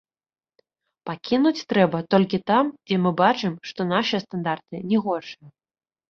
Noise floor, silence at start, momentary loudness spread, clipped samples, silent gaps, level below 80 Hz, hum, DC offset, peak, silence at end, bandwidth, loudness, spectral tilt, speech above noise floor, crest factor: under -90 dBFS; 1.05 s; 11 LU; under 0.1%; none; -64 dBFS; none; under 0.1%; -4 dBFS; 0.6 s; 6.8 kHz; -23 LUFS; -6.5 dB/octave; over 68 dB; 20 dB